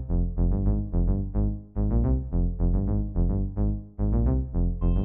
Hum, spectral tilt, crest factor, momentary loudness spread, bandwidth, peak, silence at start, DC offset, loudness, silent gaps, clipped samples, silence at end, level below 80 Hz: none; -14 dB/octave; 8 dB; 4 LU; 1.8 kHz; -16 dBFS; 0 s; 0.4%; -27 LUFS; none; under 0.1%; 0 s; -26 dBFS